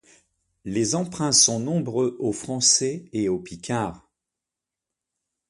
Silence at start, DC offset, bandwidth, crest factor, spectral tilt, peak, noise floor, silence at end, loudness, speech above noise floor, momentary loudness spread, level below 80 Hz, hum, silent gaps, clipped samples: 0.65 s; under 0.1%; 11.5 kHz; 22 dB; -3 dB/octave; -4 dBFS; -87 dBFS; 1.5 s; -22 LUFS; 64 dB; 13 LU; -58 dBFS; none; none; under 0.1%